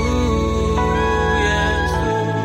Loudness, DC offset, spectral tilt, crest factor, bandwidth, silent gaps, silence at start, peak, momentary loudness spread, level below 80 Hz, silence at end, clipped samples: -18 LUFS; under 0.1%; -5.5 dB/octave; 14 dB; 15.5 kHz; none; 0 s; -4 dBFS; 2 LU; -24 dBFS; 0 s; under 0.1%